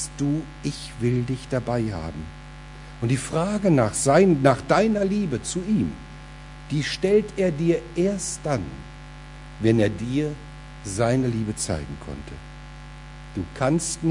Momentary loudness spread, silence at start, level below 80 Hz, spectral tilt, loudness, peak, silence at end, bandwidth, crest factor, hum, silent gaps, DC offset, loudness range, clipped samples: 22 LU; 0 s; -44 dBFS; -5.5 dB/octave; -23 LUFS; -2 dBFS; 0 s; 11 kHz; 22 dB; none; none; under 0.1%; 7 LU; under 0.1%